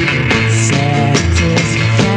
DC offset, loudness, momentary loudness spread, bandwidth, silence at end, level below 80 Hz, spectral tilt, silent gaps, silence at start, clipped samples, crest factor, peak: under 0.1%; -12 LUFS; 1 LU; 10.5 kHz; 0 s; -28 dBFS; -5 dB/octave; none; 0 s; under 0.1%; 12 dB; 0 dBFS